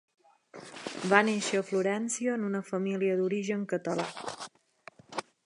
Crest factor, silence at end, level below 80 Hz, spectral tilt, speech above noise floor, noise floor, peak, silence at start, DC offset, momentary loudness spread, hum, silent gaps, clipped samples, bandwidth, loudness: 26 dB; 0.25 s; -80 dBFS; -4.5 dB/octave; 27 dB; -56 dBFS; -4 dBFS; 0.55 s; under 0.1%; 17 LU; none; none; under 0.1%; 11.5 kHz; -30 LUFS